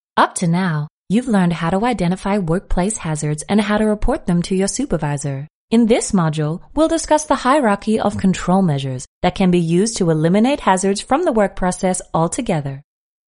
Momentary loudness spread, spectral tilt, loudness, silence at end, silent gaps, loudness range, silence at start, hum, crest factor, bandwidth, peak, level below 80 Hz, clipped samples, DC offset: 7 LU; -5.5 dB/octave; -18 LUFS; 0.45 s; 0.90-1.06 s, 5.50-5.68 s, 9.07-9.21 s; 2 LU; 0.15 s; none; 16 dB; 11 kHz; -2 dBFS; -34 dBFS; under 0.1%; under 0.1%